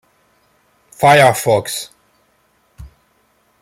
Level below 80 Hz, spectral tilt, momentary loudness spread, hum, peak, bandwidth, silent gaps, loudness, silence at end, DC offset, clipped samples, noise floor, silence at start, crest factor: -50 dBFS; -4 dB/octave; 16 LU; none; 0 dBFS; 16.5 kHz; none; -13 LUFS; 0.75 s; under 0.1%; under 0.1%; -59 dBFS; 1 s; 18 dB